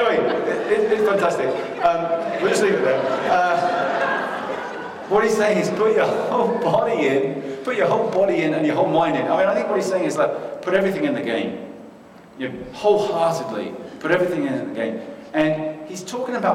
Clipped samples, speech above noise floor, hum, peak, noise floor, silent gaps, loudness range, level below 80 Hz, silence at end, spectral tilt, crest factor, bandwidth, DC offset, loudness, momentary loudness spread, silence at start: under 0.1%; 24 dB; none; -6 dBFS; -44 dBFS; none; 4 LU; -60 dBFS; 0 s; -5.5 dB/octave; 14 dB; 15 kHz; under 0.1%; -21 LUFS; 11 LU; 0 s